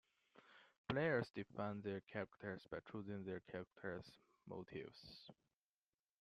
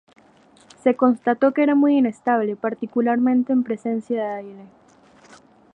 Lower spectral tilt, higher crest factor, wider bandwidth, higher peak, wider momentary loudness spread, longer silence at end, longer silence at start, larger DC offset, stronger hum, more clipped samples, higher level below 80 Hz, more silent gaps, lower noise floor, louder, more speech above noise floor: about the same, -7.5 dB/octave vs -7.5 dB/octave; about the same, 22 dB vs 18 dB; first, 11.5 kHz vs 8.2 kHz; second, -26 dBFS vs -4 dBFS; first, 23 LU vs 9 LU; second, 0.9 s vs 1.1 s; second, 0.35 s vs 0.85 s; neither; neither; neither; about the same, -78 dBFS vs -74 dBFS; first, 0.78-0.84 s vs none; first, under -90 dBFS vs -53 dBFS; second, -48 LUFS vs -20 LUFS; first, over 42 dB vs 33 dB